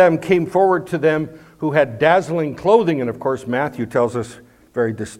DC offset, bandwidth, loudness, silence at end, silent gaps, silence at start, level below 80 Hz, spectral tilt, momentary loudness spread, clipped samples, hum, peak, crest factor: under 0.1%; 14.5 kHz; -18 LUFS; 0.05 s; none; 0 s; -56 dBFS; -7 dB/octave; 9 LU; under 0.1%; none; 0 dBFS; 18 dB